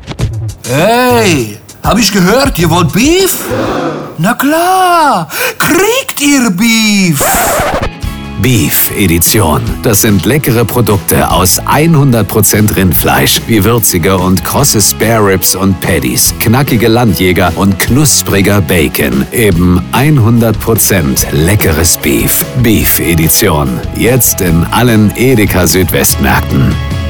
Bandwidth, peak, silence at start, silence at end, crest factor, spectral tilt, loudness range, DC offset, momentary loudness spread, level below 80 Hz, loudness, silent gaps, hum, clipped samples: over 20 kHz; 0 dBFS; 0 s; 0 s; 8 dB; -4.5 dB/octave; 2 LU; under 0.1%; 5 LU; -24 dBFS; -8 LUFS; none; none; under 0.1%